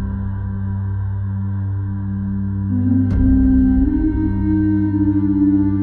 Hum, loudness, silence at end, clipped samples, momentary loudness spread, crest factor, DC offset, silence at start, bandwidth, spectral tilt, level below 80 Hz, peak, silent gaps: none; -18 LUFS; 0 s; under 0.1%; 9 LU; 12 dB; under 0.1%; 0 s; 2.3 kHz; -12.5 dB/octave; -26 dBFS; -4 dBFS; none